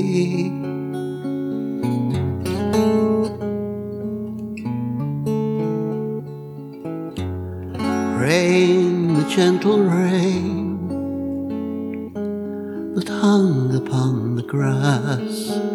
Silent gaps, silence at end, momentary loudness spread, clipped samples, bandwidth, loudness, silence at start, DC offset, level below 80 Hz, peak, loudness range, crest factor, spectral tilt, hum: none; 0 s; 12 LU; under 0.1%; 16 kHz; -21 LUFS; 0 s; under 0.1%; -54 dBFS; -2 dBFS; 7 LU; 18 dB; -7 dB/octave; none